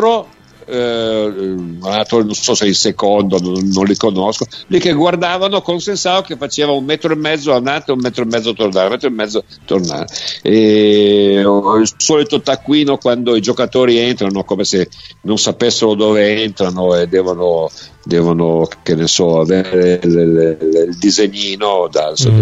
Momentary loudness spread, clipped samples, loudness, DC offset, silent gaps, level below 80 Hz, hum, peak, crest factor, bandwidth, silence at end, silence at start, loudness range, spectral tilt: 7 LU; under 0.1%; -13 LUFS; under 0.1%; none; -48 dBFS; none; 0 dBFS; 12 dB; 8.2 kHz; 0 s; 0 s; 3 LU; -4.5 dB/octave